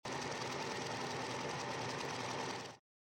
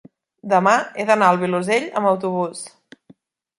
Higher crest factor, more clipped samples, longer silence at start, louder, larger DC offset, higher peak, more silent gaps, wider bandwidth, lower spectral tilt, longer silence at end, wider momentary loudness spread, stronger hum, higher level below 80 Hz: about the same, 14 dB vs 18 dB; neither; second, 0.05 s vs 0.45 s; second, -41 LUFS vs -19 LUFS; neither; second, -28 dBFS vs -2 dBFS; neither; first, 16 kHz vs 11.5 kHz; second, -3.5 dB/octave vs -5 dB/octave; second, 0.35 s vs 0.9 s; second, 4 LU vs 15 LU; neither; about the same, -74 dBFS vs -70 dBFS